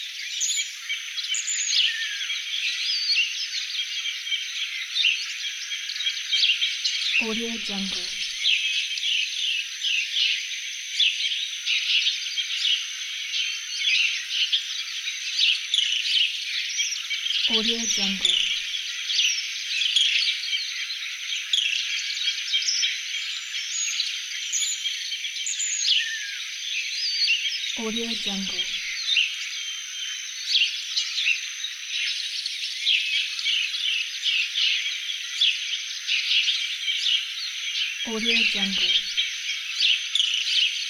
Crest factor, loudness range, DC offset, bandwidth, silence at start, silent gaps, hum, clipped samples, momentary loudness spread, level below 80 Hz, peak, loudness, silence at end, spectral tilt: 18 dB; 3 LU; under 0.1%; 17 kHz; 0 s; none; none; under 0.1%; 8 LU; -66 dBFS; -8 dBFS; -23 LUFS; 0 s; 1 dB/octave